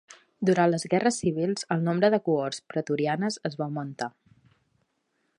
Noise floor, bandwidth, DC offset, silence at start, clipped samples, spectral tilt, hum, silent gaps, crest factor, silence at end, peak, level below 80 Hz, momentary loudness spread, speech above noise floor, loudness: -75 dBFS; 11 kHz; under 0.1%; 0.1 s; under 0.1%; -5.5 dB/octave; none; none; 18 dB; 1.3 s; -8 dBFS; -68 dBFS; 10 LU; 49 dB; -27 LUFS